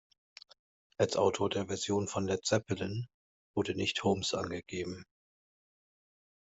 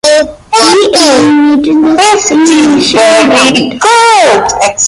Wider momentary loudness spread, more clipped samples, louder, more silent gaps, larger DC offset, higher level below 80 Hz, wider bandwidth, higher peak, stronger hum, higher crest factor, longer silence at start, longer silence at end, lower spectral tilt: first, 10 LU vs 3 LU; second, under 0.1% vs 0.3%; second, -33 LUFS vs -5 LUFS; first, 3.14-3.54 s vs none; neither; second, -70 dBFS vs -42 dBFS; second, 8.2 kHz vs 11.5 kHz; second, -14 dBFS vs 0 dBFS; neither; first, 20 dB vs 6 dB; first, 1 s vs 0.05 s; first, 1.4 s vs 0 s; first, -4.5 dB/octave vs -2.5 dB/octave